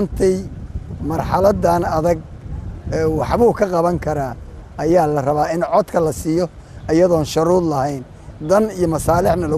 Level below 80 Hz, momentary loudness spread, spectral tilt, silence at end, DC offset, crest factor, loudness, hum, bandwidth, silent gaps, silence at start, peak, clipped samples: -34 dBFS; 16 LU; -7 dB/octave; 0 s; under 0.1%; 16 dB; -17 LUFS; none; 14.5 kHz; none; 0 s; -2 dBFS; under 0.1%